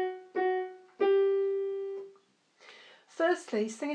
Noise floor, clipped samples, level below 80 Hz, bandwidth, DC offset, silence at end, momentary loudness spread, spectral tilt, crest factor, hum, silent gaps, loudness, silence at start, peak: -65 dBFS; under 0.1%; under -90 dBFS; 9.6 kHz; under 0.1%; 0 s; 16 LU; -4.5 dB/octave; 16 dB; none; none; -31 LUFS; 0 s; -16 dBFS